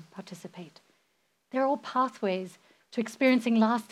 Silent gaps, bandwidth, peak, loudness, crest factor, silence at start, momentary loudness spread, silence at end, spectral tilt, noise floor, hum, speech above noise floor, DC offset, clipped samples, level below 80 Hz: none; 13.5 kHz; -12 dBFS; -28 LUFS; 18 dB; 0.15 s; 20 LU; 0.1 s; -5.5 dB/octave; -74 dBFS; none; 46 dB; under 0.1%; under 0.1%; under -90 dBFS